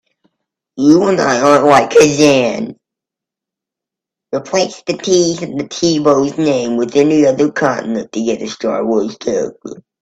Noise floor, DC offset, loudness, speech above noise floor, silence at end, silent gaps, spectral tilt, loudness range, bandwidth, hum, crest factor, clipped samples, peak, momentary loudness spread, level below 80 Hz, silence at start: -84 dBFS; under 0.1%; -13 LUFS; 72 dB; 0.2 s; none; -4.5 dB/octave; 6 LU; 12 kHz; none; 14 dB; under 0.1%; 0 dBFS; 13 LU; -54 dBFS; 0.75 s